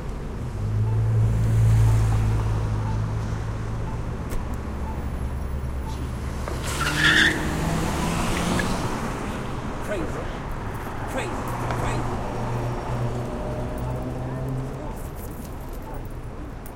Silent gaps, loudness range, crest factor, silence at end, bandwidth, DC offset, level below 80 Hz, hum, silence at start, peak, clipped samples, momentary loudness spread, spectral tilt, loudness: none; 8 LU; 20 dB; 0 s; 16.5 kHz; under 0.1%; -32 dBFS; none; 0 s; -6 dBFS; under 0.1%; 14 LU; -5.5 dB/octave; -26 LUFS